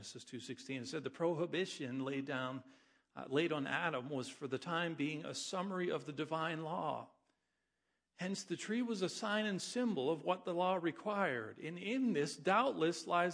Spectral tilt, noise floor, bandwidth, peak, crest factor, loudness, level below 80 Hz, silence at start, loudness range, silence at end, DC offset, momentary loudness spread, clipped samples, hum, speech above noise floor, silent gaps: -4.5 dB/octave; -87 dBFS; 10.5 kHz; -18 dBFS; 20 dB; -39 LUFS; -88 dBFS; 0 s; 5 LU; 0 s; under 0.1%; 9 LU; under 0.1%; none; 48 dB; none